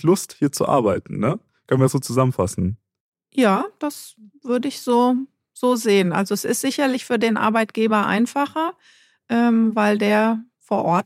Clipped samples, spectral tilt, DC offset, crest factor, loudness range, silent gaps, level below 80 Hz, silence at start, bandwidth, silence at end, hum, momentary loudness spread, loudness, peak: under 0.1%; -5.5 dB/octave; under 0.1%; 18 dB; 3 LU; 3.00-3.13 s; -56 dBFS; 0.05 s; 16 kHz; 0.05 s; none; 10 LU; -20 LUFS; -4 dBFS